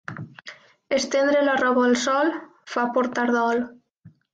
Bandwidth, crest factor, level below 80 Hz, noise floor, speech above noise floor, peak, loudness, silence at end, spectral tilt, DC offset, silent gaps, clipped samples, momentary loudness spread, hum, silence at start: 9 kHz; 14 dB; -66 dBFS; -53 dBFS; 32 dB; -10 dBFS; -22 LUFS; 0.25 s; -3.5 dB/octave; under 0.1%; 3.99-4.03 s; under 0.1%; 18 LU; none; 0.1 s